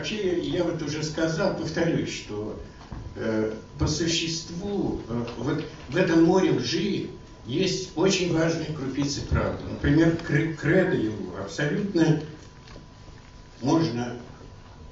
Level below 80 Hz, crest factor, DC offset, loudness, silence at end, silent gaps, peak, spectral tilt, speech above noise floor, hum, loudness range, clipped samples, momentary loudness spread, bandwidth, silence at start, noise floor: -44 dBFS; 18 dB; under 0.1%; -26 LUFS; 0 s; none; -8 dBFS; -5.5 dB/octave; 21 dB; none; 4 LU; under 0.1%; 16 LU; 8 kHz; 0 s; -46 dBFS